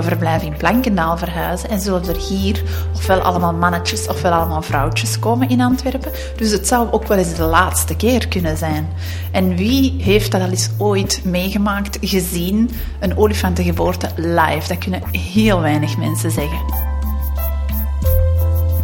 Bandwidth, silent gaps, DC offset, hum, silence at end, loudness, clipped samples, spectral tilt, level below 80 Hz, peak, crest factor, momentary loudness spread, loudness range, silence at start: 18 kHz; none; under 0.1%; none; 0 s; -17 LUFS; under 0.1%; -5.5 dB/octave; -24 dBFS; 0 dBFS; 16 dB; 6 LU; 2 LU; 0 s